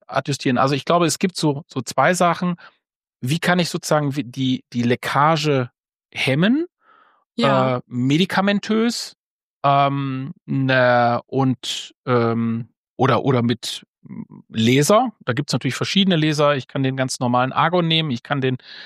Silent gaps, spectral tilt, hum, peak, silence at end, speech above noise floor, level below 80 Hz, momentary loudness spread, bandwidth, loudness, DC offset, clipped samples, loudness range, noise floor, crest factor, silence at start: 2.95-3.01 s, 6.05-6.09 s, 7.26-7.30 s, 9.17-9.61 s, 10.42-10.46 s, 11.95-12.04 s, 12.77-12.96 s, 13.88-13.94 s; -5 dB/octave; none; -2 dBFS; 0 s; 36 dB; -64 dBFS; 11 LU; 15.5 kHz; -19 LUFS; under 0.1%; under 0.1%; 2 LU; -56 dBFS; 18 dB; 0.1 s